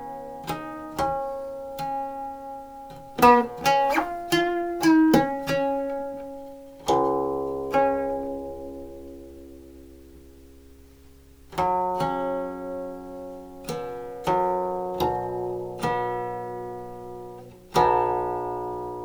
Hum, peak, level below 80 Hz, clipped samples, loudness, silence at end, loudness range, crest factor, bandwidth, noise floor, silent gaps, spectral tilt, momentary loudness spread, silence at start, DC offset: none; -6 dBFS; -52 dBFS; under 0.1%; -25 LUFS; 0 s; 10 LU; 22 dB; over 20 kHz; -50 dBFS; none; -5.5 dB/octave; 19 LU; 0 s; under 0.1%